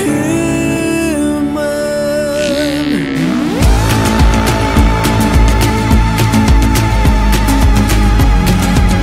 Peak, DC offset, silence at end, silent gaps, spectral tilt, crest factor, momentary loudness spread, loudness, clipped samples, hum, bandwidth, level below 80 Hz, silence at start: 0 dBFS; under 0.1%; 0 s; none; -5.5 dB/octave; 10 dB; 4 LU; -12 LUFS; under 0.1%; none; 16 kHz; -14 dBFS; 0 s